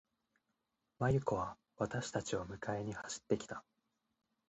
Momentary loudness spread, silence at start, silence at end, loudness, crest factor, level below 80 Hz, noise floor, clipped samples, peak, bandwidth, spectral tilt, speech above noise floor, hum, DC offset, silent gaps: 10 LU; 1 s; 0.9 s; -40 LUFS; 20 dB; -64 dBFS; -86 dBFS; under 0.1%; -20 dBFS; 8.4 kHz; -5.5 dB/octave; 47 dB; none; under 0.1%; none